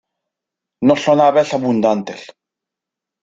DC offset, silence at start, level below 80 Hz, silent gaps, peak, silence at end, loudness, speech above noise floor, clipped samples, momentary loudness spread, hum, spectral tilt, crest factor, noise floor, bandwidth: under 0.1%; 0.8 s; -60 dBFS; none; -2 dBFS; 1 s; -15 LUFS; 70 dB; under 0.1%; 13 LU; none; -6 dB/octave; 16 dB; -84 dBFS; 7.8 kHz